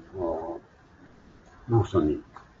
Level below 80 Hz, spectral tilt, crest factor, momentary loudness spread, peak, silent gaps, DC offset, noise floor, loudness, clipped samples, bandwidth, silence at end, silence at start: -50 dBFS; -9 dB/octave; 18 dB; 21 LU; -12 dBFS; none; under 0.1%; -54 dBFS; -28 LUFS; under 0.1%; 7.6 kHz; 0.2 s; 0 s